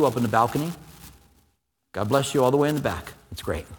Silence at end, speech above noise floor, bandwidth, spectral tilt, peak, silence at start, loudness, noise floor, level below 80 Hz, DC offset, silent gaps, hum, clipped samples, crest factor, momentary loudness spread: 0 s; 47 dB; 19 kHz; -5.5 dB/octave; -4 dBFS; 0 s; -24 LUFS; -71 dBFS; -48 dBFS; under 0.1%; none; none; under 0.1%; 20 dB; 16 LU